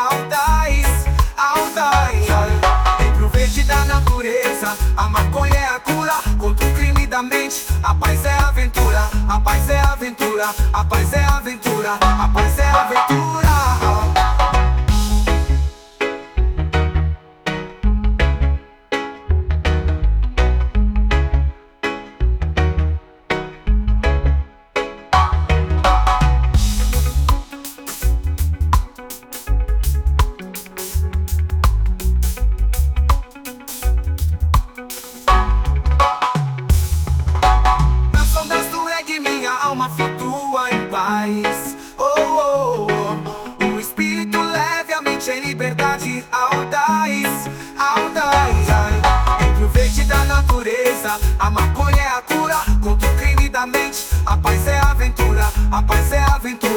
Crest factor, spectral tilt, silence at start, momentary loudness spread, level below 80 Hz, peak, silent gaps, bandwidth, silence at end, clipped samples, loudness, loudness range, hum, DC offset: 14 dB; -5 dB/octave; 0 s; 8 LU; -18 dBFS; -2 dBFS; none; 19.5 kHz; 0 s; under 0.1%; -18 LUFS; 4 LU; none; under 0.1%